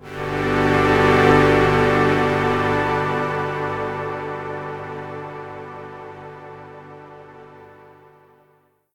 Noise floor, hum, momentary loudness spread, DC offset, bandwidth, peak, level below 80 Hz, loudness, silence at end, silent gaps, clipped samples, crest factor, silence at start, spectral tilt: -60 dBFS; 50 Hz at -50 dBFS; 23 LU; under 0.1%; 15.5 kHz; 0 dBFS; -42 dBFS; -19 LUFS; 1.25 s; none; under 0.1%; 20 dB; 0 s; -6.5 dB/octave